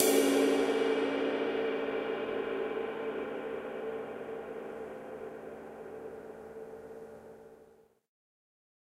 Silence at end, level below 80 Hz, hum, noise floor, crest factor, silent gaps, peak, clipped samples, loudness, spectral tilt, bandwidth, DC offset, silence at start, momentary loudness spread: 1.3 s; -72 dBFS; none; -61 dBFS; 24 dB; none; -10 dBFS; under 0.1%; -33 LUFS; -3 dB/octave; 16 kHz; under 0.1%; 0 s; 19 LU